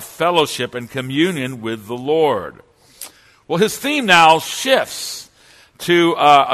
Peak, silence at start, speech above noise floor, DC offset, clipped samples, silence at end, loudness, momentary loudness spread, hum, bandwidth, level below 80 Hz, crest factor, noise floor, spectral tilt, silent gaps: 0 dBFS; 0 s; 33 dB; under 0.1%; under 0.1%; 0 s; -16 LUFS; 19 LU; none; 14 kHz; -58 dBFS; 18 dB; -49 dBFS; -3.5 dB/octave; none